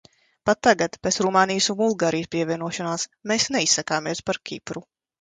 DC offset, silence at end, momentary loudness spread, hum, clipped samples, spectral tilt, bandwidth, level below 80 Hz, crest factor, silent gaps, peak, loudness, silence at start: under 0.1%; 0.4 s; 10 LU; none; under 0.1%; -3 dB/octave; 10 kHz; -58 dBFS; 20 dB; none; -4 dBFS; -22 LUFS; 0.45 s